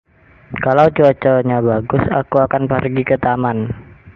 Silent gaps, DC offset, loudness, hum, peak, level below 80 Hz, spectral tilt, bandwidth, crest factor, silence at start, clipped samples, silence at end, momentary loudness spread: none; under 0.1%; -15 LUFS; none; 0 dBFS; -42 dBFS; -9.5 dB/octave; 6.4 kHz; 16 dB; 0.5 s; under 0.1%; 0.05 s; 10 LU